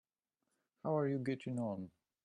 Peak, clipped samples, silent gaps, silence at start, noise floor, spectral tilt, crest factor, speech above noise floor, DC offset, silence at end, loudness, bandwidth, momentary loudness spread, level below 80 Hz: -24 dBFS; under 0.1%; none; 0.85 s; -89 dBFS; -8.5 dB/octave; 16 dB; 51 dB; under 0.1%; 0.35 s; -40 LUFS; 11 kHz; 11 LU; -80 dBFS